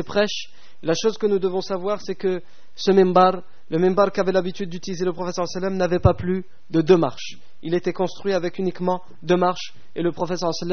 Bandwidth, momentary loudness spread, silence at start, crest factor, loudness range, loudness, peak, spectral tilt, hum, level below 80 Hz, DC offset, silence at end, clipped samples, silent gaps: 6.6 kHz; 13 LU; 0 s; 20 dB; 3 LU; -22 LUFS; -2 dBFS; -5.5 dB/octave; none; -46 dBFS; 3%; 0 s; under 0.1%; none